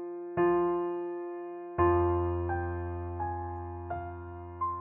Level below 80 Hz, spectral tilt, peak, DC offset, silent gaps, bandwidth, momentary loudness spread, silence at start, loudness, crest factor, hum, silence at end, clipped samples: -54 dBFS; -12 dB/octave; -16 dBFS; under 0.1%; none; 3 kHz; 13 LU; 0 s; -32 LUFS; 16 dB; none; 0 s; under 0.1%